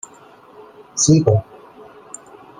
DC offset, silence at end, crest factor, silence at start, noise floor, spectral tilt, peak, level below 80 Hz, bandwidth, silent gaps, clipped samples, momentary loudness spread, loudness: under 0.1%; 1.2 s; 20 dB; 0.95 s; -45 dBFS; -5.5 dB/octave; 0 dBFS; -50 dBFS; 10 kHz; none; under 0.1%; 24 LU; -16 LUFS